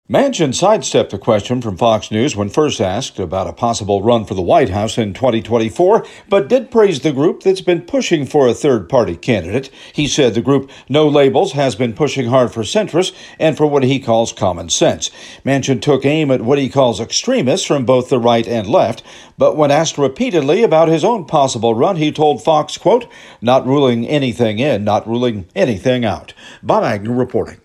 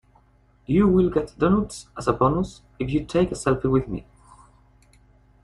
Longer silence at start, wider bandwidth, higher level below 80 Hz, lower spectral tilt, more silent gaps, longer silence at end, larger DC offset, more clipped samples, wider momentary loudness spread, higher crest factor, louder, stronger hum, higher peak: second, 0.1 s vs 0.7 s; first, 13 kHz vs 11.5 kHz; second, -48 dBFS vs -42 dBFS; second, -5 dB/octave vs -7.5 dB/octave; neither; second, 0.1 s vs 1.45 s; neither; neither; second, 5 LU vs 13 LU; second, 14 dB vs 20 dB; first, -15 LUFS vs -23 LUFS; second, none vs 50 Hz at -45 dBFS; first, 0 dBFS vs -4 dBFS